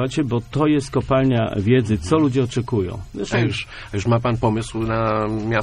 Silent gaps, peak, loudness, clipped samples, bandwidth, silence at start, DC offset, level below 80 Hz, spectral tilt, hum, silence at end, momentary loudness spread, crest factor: none; -4 dBFS; -20 LUFS; under 0.1%; 11 kHz; 0 s; under 0.1%; -40 dBFS; -7 dB/octave; none; 0 s; 6 LU; 16 dB